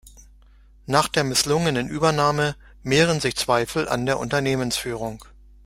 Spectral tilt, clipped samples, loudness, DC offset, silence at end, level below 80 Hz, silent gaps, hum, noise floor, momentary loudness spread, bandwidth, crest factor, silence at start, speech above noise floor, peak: -4 dB/octave; under 0.1%; -22 LUFS; under 0.1%; 0.45 s; -46 dBFS; none; none; -51 dBFS; 8 LU; 16 kHz; 22 dB; 0.05 s; 29 dB; -2 dBFS